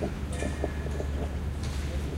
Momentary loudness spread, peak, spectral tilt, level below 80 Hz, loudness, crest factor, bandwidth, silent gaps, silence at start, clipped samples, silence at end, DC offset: 1 LU; -14 dBFS; -6 dB/octave; -34 dBFS; -33 LUFS; 16 dB; 13.5 kHz; none; 0 s; under 0.1%; 0 s; under 0.1%